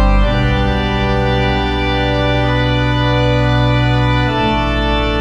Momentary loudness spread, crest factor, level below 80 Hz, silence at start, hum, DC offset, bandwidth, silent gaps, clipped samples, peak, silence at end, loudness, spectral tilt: 2 LU; 12 dB; -20 dBFS; 0 s; none; under 0.1%; 7.8 kHz; none; under 0.1%; -2 dBFS; 0 s; -14 LUFS; -7 dB/octave